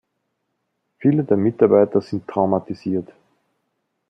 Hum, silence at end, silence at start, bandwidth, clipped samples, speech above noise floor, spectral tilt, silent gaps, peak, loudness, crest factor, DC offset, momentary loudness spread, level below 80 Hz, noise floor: none; 1.05 s; 1 s; 6.2 kHz; under 0.1%; 56 dB; -10.5 dB/octave; none; -2 dBFS; -19 LUFS; 18 dB; under 0.1%; 10 LU; -66 dBFS; -74 dBFS